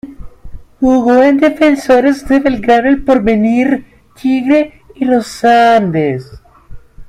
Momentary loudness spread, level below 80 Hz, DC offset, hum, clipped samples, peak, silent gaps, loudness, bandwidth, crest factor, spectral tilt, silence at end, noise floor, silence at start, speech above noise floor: 8 LU; -36 dBFS; under 0.1%; none; under 0.1%; 0 dBFS; none; -11 LUFS; 13 kHz; 12 dB; -6.5 dB/octave; 0.05 s; -31 dBFS; 0.05 s; 21 dB